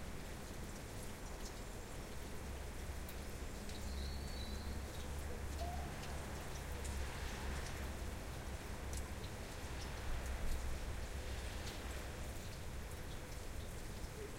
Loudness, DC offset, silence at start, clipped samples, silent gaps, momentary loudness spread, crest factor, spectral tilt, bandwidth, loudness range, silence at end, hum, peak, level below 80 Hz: -47 LUFS; under 0.1%; 0 s; under 0.1%; none; 4 LU; 16 dB; -4.5 dB/octave; 16 kHz; 2 LU; 0 s; none; -28 dBFS; -48 dBFS